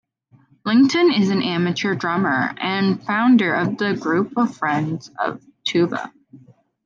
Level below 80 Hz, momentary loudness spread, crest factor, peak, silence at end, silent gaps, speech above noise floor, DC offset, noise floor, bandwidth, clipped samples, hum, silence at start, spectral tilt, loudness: -66 dBFS; 11 LU; 14 dB; -6 dBFS; 0.5 s; none; 37 dB; under 0.1%; -56 dBFS; 7.4 kHz; under 0.1%; none; 0.65 s; -6 dB/octave; -19 LUFS